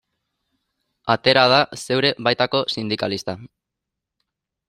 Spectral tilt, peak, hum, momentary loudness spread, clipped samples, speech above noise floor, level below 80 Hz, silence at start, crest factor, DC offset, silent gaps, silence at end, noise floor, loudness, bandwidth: -4.5 dB/octave; 0 dBFS; none; 15 LU; under 0.1%; 64 dB; -60 dBFS; 1.05 s; 22 dB; under 0.1%; none; 1.2 s; -83 dBFS; -19 LUFS; 14.5 kHz